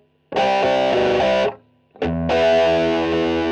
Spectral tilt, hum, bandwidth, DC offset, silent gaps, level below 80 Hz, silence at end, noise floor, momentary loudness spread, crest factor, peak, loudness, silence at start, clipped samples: -5.5 dB/octave; none; 9 kHz; under 0.1%; none; -42 dBFS; 0 s; -44 dBFS; 9 LU; 12 dB; -8 dBFS; -18 LUFS; 0.3 s; under 0.1%